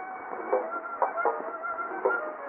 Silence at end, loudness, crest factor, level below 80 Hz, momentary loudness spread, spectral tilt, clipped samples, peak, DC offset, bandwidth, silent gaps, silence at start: 0 s; -31 LUFS; 20 dB; -80 dBFS; 7 LU; 4 dB/octave; under 0.1%; -12 dBFS; under 0.1%; 3.2 kHz; none; 0 s